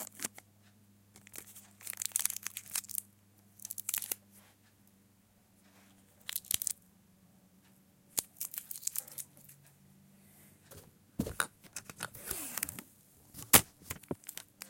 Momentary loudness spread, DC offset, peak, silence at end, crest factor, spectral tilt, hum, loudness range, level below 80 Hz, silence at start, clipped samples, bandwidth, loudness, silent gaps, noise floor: 18 LU; under 0.1%; -4 dBFS; 0 s; 38 dB; -1.5 dB/octave; none; 10 LU; -66 dBFS; 0 s; under 0.1%; 17 kHz; -35 LUFS; none; -67 dBFS